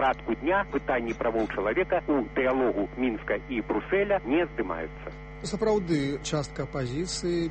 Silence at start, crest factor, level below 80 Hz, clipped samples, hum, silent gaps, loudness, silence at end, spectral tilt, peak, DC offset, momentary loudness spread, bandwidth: 0 s; 16 dB; -46 dBFS; under 0.1%; none; none; -28 LUFS; 0 s; -5.5 dB/octave; -12 dBFS; under 0.1%; 7 LU; 8.4 kHz